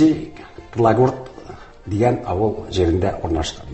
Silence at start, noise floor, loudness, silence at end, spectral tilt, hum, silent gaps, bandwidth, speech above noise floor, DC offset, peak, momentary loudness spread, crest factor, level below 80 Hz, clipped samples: 0 s; -38 dBFS; -20 LUFS; 0 s; -7 dB/octave; none; none; 8.4 kHz; 20 dB; under 0.1%; -2 dBFS; 21 LU; 18 dB; -34 dBFS; under 0.1%